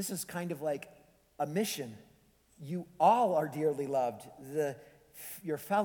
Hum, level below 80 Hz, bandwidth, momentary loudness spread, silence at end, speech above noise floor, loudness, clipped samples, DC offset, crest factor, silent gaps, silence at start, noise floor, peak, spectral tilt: none; -74 dBFS; 19.5 kHz; 19 LU; 0 s; 33 dB; -33 LUFS; under 0.1%; under 0.1%; 20 dB; none; 0 s; -66 dBFS; -14 dBFS; -5 dB/octave